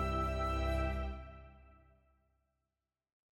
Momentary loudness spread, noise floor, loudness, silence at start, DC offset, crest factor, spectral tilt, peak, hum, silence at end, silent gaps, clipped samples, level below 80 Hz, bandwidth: 17 LU; under -90 dBFS; -37 LUFS; 0 s; under 0.1%; 14 dB; -7 dB/octave; -26 dBFS; none; 1.8 s; none; under 0.1%; -44 dBFS; 16 kHz